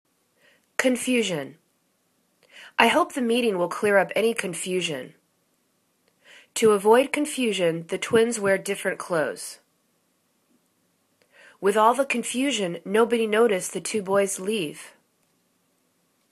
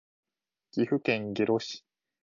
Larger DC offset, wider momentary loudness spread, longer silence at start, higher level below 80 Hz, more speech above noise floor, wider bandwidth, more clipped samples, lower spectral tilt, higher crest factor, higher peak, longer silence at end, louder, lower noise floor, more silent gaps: neither; about the same, 10 LU vs 11 LU; about the same, 0.8 s vs 0.75 s; about the same, -70 dBFS vs -72 dBFS; first, 46 dB vs 37 dB; first, 14 kHz vs 7.4 kHz; neither; second, -3.5 dB/octave vs -6 dB/octave; about the same, 24 dB vs 20 dB; first, -2 dBFS vs -12 dBFS; first, 1.45 s vs 0.5 s; first, -23 LUFS vs -30 LUFS; about the same, -69 dBFS vs -66 dBFS; neither